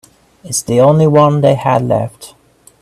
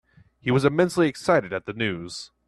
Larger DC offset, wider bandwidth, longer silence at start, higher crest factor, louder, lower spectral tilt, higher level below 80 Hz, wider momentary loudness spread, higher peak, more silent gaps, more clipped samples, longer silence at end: neither; about the same, 14 kHz vs 13 kHz; about the same, 0.45 s vs 0.45 s; second, 12 dB vs 18 dB; first, -11 LUFS vs -23 LUFS; about the same, -6 dB/octave vs -6 dB/octave; first, -48 dBFS vs -58 dBFS; about the same, 10 LU vs 11 LU; first, 0 dBFS vs -6 dBFS; neither; neither; first, 0.55 s vs 0.2 s